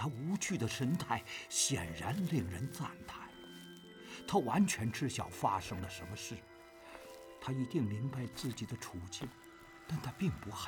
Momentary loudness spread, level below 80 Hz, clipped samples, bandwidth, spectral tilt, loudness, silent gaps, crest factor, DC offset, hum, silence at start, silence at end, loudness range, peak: 19 LU; -66 dBFS; under 0.1%; over 20 kHz; -4.5 dB/octave; -38 LUFS; none; 20 dB; under 0.1%; none; 0 s; 0 s; 5 LU; -18 dBFS